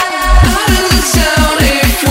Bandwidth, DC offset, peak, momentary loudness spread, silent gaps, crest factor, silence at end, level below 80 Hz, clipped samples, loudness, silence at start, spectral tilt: 16.5 kHz; under 0.1%; 0 dBFS; 1 LU; none; 10 dB; 0 s; -14 dBFS; 0.3%; -10 LUFS; 0 s; -3.5 dB/octave